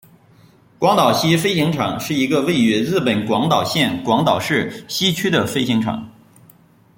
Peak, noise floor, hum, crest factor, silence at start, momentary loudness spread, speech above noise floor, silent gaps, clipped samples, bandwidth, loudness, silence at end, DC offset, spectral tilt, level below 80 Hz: -2 dBFS; -50 dBFS; none; 16 dB; 0.8 s; 5 LU; 33 dB; none; under 0.1%; 17 kHz; -17 LUFS; 0.9 s; under 0.1%; -5 dB/octave; -54 dBFS